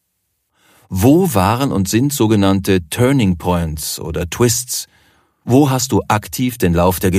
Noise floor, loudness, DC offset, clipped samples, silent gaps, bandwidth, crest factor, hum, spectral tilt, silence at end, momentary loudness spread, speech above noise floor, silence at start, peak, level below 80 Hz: -69 dBFS; -15 LUFS; under 0.1%; under 0.1%; none; 15.5 kHz; 14 dB; none; -5.5 dB/octave; 0 s; 9 LU; 54 dB; 0.9 s; 0 dBFS; -38 dBFS